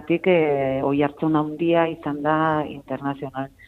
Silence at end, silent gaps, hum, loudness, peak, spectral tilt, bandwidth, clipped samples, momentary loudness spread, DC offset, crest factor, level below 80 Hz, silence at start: 0.2 s; none; none; -22 LUFS; -6 dBFS; -9 dB/octave; 4.3 kHz; under 0.1%; 10 LU; under 0.1%; 16 dB; -56 dBFS; 0 s